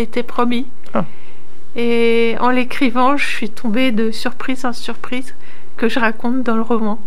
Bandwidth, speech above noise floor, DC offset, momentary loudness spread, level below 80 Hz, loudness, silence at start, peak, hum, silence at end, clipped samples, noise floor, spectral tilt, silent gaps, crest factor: 14.5 kHz; 28 dB; 20%; 11 LU; -52 dBFS; -18 LUFS; 0 s; -2 dBFS; none; 0.05 s; under 0.1%; -45 dBFS; -5.5 dB/octave; none; 18 dB